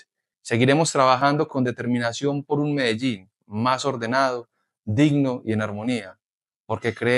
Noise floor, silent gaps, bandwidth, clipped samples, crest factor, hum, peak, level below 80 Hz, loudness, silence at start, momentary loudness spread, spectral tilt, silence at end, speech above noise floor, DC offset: under -90 dBFS; 4.79-4.83 s, 6.30-6.41 s, 6.56-6.64 s; 12 kHz; under 0.1%; 18 dB; none; -4 dBFS; -66 dBFS; -22 LUFS; 0.45 s; 13 LU; -5.5 dB/octave; 0 s; over 68 dB; under 0.1%